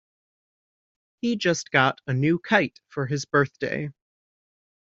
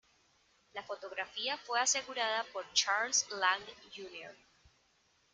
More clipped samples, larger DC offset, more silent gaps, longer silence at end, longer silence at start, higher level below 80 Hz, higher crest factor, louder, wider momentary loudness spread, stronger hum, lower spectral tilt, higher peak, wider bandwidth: neither; neither; neither; about the same, 0.95 s vs 1 s; first, 1.25 s vs 0.75 s; first, -64 dBFS vs -80 dBFS; about the same, 22 dB vs 24 dB; first, -24 LUFS vs -33 LUFS; second, 10 LU vs 18 LU; neither; first, -4.5 dB/octave vs 1.5 dB/octave; first, -4 dBFS vs -14 dBFS; second, 7.8 kHz vs 11 kHz